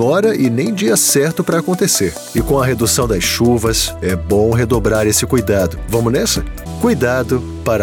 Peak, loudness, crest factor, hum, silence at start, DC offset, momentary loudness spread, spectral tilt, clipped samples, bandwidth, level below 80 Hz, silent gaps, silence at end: -2 dBFS; -14 LUFS; 12 dB; none; 0 s; under 0.1%; 6 LU; -4.5 dB/octave; under 0.1%; 19 kHz; -30 dBFS; none; 0 s